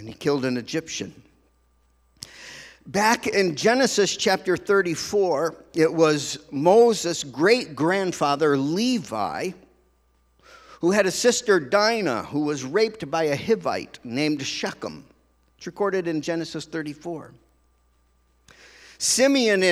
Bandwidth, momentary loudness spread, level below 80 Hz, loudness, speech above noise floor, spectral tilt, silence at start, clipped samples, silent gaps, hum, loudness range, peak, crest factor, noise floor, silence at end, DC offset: 15 kHz; 14 LU; -62 dBFS; -22 LUFS; 41 dB; -3.5 dB/octave; 0 s; under 0.1%; none; none; 9 LU; -4 dBFS; 20 dB; -63 dBFS; 0 s; under 0.1%